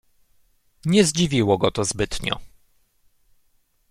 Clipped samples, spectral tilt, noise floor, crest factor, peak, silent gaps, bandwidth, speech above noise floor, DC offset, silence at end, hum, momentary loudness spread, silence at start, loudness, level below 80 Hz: under 0.1%; -4.5 dB/octave; -63 dBFS; 20 dB; -4 dBFS; none; 15.5 kHz; 43 dB; under 0.1%; 1.45 s; none; 11 LU; 0.85 s; -21 LUFS; -44 dBFS